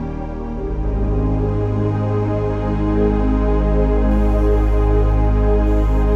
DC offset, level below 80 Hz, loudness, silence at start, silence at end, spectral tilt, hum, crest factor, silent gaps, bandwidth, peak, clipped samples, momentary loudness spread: under 0.1%; -18 dBFS; -18 LUFS; 0 s; 0 s; -10 dB/octave; none; 12 dB; none; 3.7 kHz; -4 dBFS; under 0.1%; 6 LU